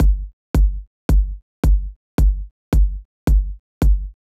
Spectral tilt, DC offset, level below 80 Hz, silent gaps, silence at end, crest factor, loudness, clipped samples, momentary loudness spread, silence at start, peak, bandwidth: -8 dB/octave; under 0.1%; -18 dBFS; 0.33-0.54 s, 0.87-1.09 s, 1.42-1.63 s, 1.96-2.18 s, 2.51-2.72 s, 3.05-3.27 s, 3.59-3.81 s; 0.25 s; 12 dB; -22 LUFS; under 0.1%; 7 LU; 0 s; -6 dBFS; 13.5 kHz